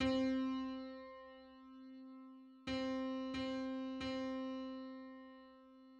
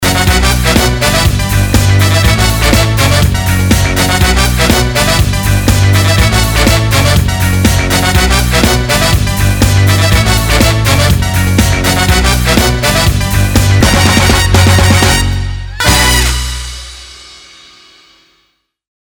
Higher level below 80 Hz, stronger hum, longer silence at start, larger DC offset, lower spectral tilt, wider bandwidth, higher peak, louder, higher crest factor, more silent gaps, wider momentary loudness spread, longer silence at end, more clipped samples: second, -66 dBFS vs -16 dBFS; neither; about the same, 0 s vs 0 s; neither; first, -5.5 dB/octave vs -4 dB/octave; second, 8 kHz vs over 20 kHz; second, -26 dBFS vs 0 dBFS; second, -43 LUFS vs -9 LUFS; first, 18 dB vs 10 dB; neither; first, 19 LU vs 4 LU; second, 0 s vs 1.7 s; second, under 0.1% vs 0.1%